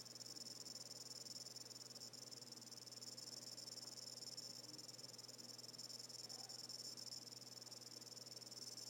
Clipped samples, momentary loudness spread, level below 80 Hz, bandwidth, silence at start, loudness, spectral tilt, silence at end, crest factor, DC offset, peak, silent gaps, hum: under 0.1%; 3 LU; under -90 dBFS; 16 kHz; 0 s; -53 LUFS; -1 dB/octave; 0 s; 16 dB; under 0.1%; -40 dBFS; none; none